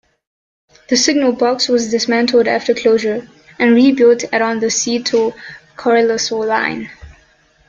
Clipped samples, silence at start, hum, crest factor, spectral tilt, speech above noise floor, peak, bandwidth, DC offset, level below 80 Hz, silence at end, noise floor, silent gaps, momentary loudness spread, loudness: under 0.1%; 0.9 s; none; 14 dB; -2.5 dB/octave; 38 dB; 0 dBFS; 7.6 kHz; under 0.1%; -52 dBFS; 0.6 s; -52 dBFS; none; 10 LU; -14 LUFS